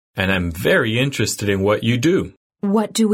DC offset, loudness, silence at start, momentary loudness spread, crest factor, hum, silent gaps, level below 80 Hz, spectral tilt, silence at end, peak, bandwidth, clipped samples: under 0.1%; -19 LUFS; 0.15 s; 4 LU; 16 dB; none; 2.37-2.50 s; -44 dBFS; -5 dB/octave; 0 s; -4 dBFS; 16.5 kHz; under 0.1%